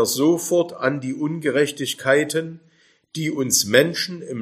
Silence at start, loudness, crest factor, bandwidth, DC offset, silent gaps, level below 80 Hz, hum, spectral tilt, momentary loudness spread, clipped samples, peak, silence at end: 0 s; -20 LUFS; 22 dB; 15.5 kHz; under 0.1%; none; -68 dBFS; none; -3.5 dB/octave; 10 LU; under 0.1%; 0 dBFS; 0 s